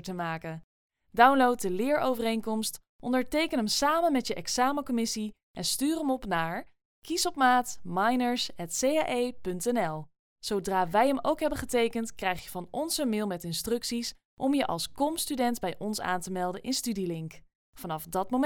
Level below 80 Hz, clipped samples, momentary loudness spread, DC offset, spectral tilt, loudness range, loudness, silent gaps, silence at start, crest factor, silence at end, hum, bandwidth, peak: -56 dBFS; under 0.1%; 10 LU; under 0.1%; -3.5 dB/octave; 3 LU; -29 LUFS; 0.64-0.90 s, 2.89-2.99 s, 5.43-5.54 s, 6.85-7.02 s, 10.19-10.36 s, 14.25-14.37 s, 17.55-17.73 s; 0.05 s; 22 dB; 0 s; none; 20 kHz; -6 dBFS